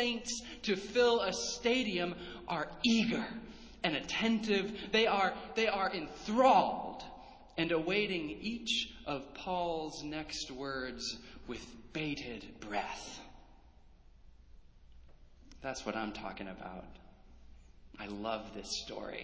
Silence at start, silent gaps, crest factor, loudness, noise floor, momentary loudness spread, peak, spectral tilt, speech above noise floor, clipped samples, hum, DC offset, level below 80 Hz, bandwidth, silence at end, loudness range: 0 s; none; 22 dB; -35 LUFS; -59 dBFS; 16 LU; -14 dBFS; -3.5 dB/octave; 24 dB; under 0.1%; none; under 0.1%; -60 dBFS; 8 kHz; 0 s; 13 LU